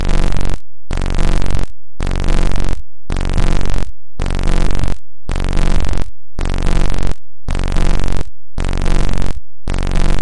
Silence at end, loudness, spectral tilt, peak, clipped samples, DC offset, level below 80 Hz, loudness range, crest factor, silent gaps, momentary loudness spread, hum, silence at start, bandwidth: 0 s; -22 LUFS; -5.5 dB/octave; 0 dBFS; under 0.1%; 20%; -14 dBFS; 1 LU; 8 dB; none; 8 LU; none; 0 s; 10.5 kHz